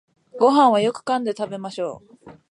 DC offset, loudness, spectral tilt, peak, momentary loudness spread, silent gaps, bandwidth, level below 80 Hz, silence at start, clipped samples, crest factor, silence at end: under 0.1%; -20 LUFS; -5.5 dB/octave; -4 dBFS; 15 LU; none; 11 kHz; -70 dBFS; 0.35 s; under 0.1%; 18 dB; 0.2 s